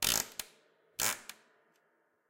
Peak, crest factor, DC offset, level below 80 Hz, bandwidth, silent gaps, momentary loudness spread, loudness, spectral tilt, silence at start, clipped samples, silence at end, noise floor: -10 dBFS; 30 dB; under 0.1%; -62 dBFS; 17 kHz; none; 19 LU; -35 LUFS; 0 dB/octave; 0 s; under 0.1%; 0.95 s; -75 dBFS